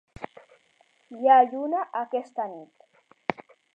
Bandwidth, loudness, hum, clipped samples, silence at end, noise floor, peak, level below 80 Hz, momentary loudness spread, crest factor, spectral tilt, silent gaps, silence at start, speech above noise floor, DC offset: 5.2 kHz; -25 LUFS; none; under 0.1%; 0.45 s; -64 dBFS; -4 dBFS; -66 dBFS; 25 LU; 22 dB; -6.5 dB/octave; none; 0.2 s; 41 dB; under 0.1%